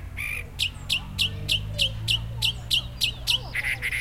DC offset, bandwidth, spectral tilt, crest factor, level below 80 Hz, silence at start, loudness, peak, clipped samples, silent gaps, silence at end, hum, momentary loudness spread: under 0.1%; 16.5 kHz; -2 dB/octave; 18 dB; -40 dBFS; 0 s; -25 LUFS; -10 dBFS; under 0.1%; none; 0 s; none; 5 LU